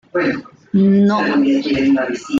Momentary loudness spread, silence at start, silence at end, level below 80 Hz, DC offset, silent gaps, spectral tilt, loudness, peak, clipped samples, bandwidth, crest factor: 8 LU; 0.15 s; 0 s; -52 dBFS; under 0.1%; none; -7 dB/octave; -15 LUFS; -6 dBFS; under 0.1%; 7.6 kHz; 10 dB